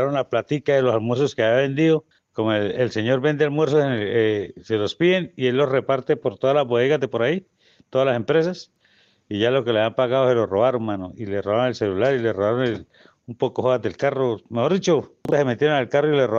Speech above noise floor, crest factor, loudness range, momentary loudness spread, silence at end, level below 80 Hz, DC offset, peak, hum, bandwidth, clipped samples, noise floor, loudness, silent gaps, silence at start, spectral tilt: 39 dB; 14 dB; 2 LU; 7 LU; 0 s; -64 dBFS; under 0.1%; -6 dBFS; none; 7.4 kHz; under 0.1%; -60 dBFS; -21 LUFS; none; 0 s; -6.5 dB/octave